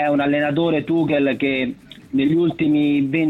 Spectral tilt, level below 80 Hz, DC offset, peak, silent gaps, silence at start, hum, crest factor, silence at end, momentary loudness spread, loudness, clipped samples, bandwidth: -8 dB/octave; -54 dBFS; under 0.1%; -8 dBFS; none; 0 s; none; 12 dB; 0 s; 6 LU; -19 LUFS; under 0.1%; 4.3 kHz